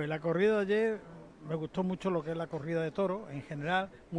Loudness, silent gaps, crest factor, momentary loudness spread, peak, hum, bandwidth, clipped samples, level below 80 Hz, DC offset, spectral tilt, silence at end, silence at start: -33 LUFS; none; 16 dB; 12 LU; -18 dBFS; none; 10 kHz; under 0.1%; -64 dBFS; under 0.1%; -7.5 dB/octave; 0 s; 0 s